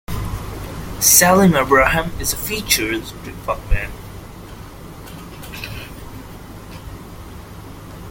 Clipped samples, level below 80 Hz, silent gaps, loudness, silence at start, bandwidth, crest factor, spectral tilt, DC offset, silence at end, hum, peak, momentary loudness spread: under 0.1%; -32 dBFS; none; -16 LUFS; 0.1 s; 17 kHz; 20 dB; -3 dB/octave; under 0.1%; 0 s; none; 0 dBFS; 25 LU